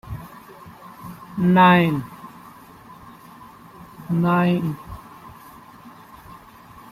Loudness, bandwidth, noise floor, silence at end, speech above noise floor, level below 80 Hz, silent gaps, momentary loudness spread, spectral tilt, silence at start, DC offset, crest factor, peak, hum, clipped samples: -19 LUFS; 15 kHz; -45 dBFS; 0.6 s; 28 dB; -52 dBFS; none; 29 LU; -8 dB/octave; 0.05 s; under 0.1%; 20 dB; -4 dBFS; none; under 0.1%